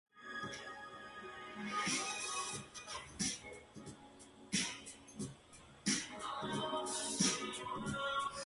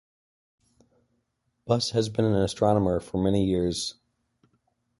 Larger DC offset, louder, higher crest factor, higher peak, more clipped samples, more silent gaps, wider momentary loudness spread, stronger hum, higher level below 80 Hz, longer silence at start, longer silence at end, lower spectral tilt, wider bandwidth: neither; second, -40 LUFS vs -25 LUFS; about the same, 22 dB vs 20 dB; second, -22 dBFS vs -8 dBFS; neither; neither; first, 17 LU vs 5 LU; neither; second, -68 dBFS vs -48 dBFS; second, 0.15 s vs 1.65 s; second, 0 s vs 1.1 s; second, -2 dB/octave vs -6 dB/octave; about the same, 11.5 kHz vs 11.5 kHz